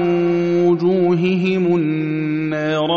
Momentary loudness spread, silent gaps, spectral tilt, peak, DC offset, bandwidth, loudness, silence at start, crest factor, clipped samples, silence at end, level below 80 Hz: 5 LU; none; -6 dB/octave; -6 dBFS; 0.2%; 7 kHz; -17 LUFS; 0 s; 12 dB; under 0.1%; 0 s; -58 dBFS